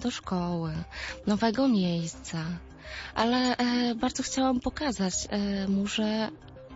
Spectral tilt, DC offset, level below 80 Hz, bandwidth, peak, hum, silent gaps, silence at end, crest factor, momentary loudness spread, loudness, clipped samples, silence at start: -4.5 dB/octave; under 0.1%; -50 dBFS; 8 kHz; -12 dBFS; none; none; 0 s; 16 dB; 10 LU; -29 LUFS; under 0.1%; 0 s